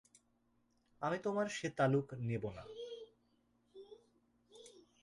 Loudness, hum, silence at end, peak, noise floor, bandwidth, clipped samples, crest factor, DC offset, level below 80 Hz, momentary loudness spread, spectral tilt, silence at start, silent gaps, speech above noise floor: -39 LUFS; none; 0.2 s; -20 dBFS; -77 dBFS; 11.5 kHz; under 0.1%; 22 dB; under 0.1%; -72 dBFS; 26 LU; -6 dB/octave; 1 s; none; 39 dB